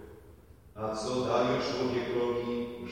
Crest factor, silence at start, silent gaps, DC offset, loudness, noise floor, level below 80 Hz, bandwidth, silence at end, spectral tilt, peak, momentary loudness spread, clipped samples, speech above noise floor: 18 dB; 0 s; none; under 0.1%; -31 LUFS; -54 dBFS; -58 dBFS; 16 kHz; 0 s; -5.5 dB/octave; -14 dBFS; 10 LU; under 0.1%; 24 dB